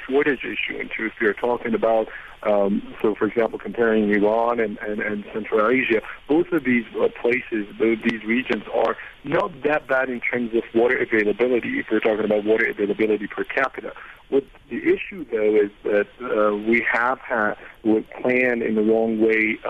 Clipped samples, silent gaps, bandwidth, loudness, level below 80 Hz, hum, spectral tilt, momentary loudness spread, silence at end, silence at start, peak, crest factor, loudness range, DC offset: under 0.1%; none; 6.2 kHz; -22 LUFS; -54 dBFS; none; -7.5 dB/octave; 7 LU; 0 s; 0 s; -6 dBFS; 16 dB; 2 LU; under 0.1%